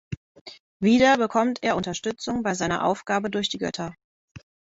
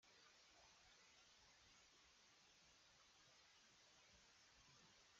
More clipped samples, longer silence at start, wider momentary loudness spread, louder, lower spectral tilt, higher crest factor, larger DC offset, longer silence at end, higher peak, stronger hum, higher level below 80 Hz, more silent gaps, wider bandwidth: neither; about the same, 0.1 s vs 0 s; first, 20 LU vs 0 LU; first, -24 LUFS vs -70 LUFS; first, -4.5 dB/octave vs -0.5 dB/octave; first, 20 dB vs 14 dB; neither; first, 0.3 s vs 0 s; first, -6 dBFS vs -58 dBFS; neither; first, -56 dBFS vs -90 dBFS; first, 0.17-0.35 s, 0.41-0.45 s, 0.60-0.80 s, 4.04-4.35 s vs none; about the same, 8 kHz vs 7.6 kHz